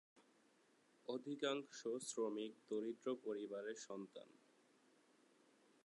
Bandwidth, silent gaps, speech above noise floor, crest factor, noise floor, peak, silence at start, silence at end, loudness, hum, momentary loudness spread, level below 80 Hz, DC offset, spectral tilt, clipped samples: 11 kHz; none; 29 dB; 22 dB; -76 dBFS; -28 dBFS; 0.15 s; 1.55 s; -47 LUFS; none; 11 LU; under -90 dBFS; under 0.1%; -3.5 dB/octave; under 0.1%